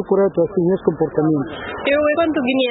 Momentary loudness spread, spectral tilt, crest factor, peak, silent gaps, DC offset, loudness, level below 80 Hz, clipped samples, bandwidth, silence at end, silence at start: 5 LU; -11.5 dB/octave; 16 dB; -2 dBFS; none; under 0.1%; -18 LUFS; -48 dBFS; under 0.1%; 4.1 kHz; 0 s; 0 s